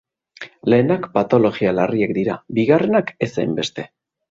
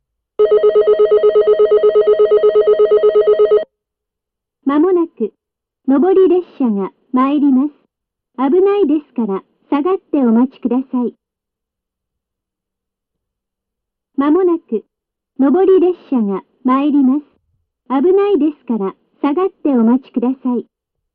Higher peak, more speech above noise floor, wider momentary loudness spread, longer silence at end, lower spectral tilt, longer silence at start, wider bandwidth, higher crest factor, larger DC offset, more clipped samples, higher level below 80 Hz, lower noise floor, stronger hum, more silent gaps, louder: about the same, -2 dBFS vs -4 dBFS; second, 22 dB vs 67 dB; about the same, 12 LU vs 10 LU; about the same, 0.45 s vs 0.5 s; second, -7 dB/octave vs -10.5 dB/octave; about the same, 0.4 s vs 0.4 s; first, 7.8 kHz vs 4.7 kHz; first, 18 dB vs 10 dB; neither; neither; about the same, -56 dBFS vs -58 dBFS; second, -40 dBFS vs -82 dBFS; neither; neither; second, -18 LUFS vs -14 LUFS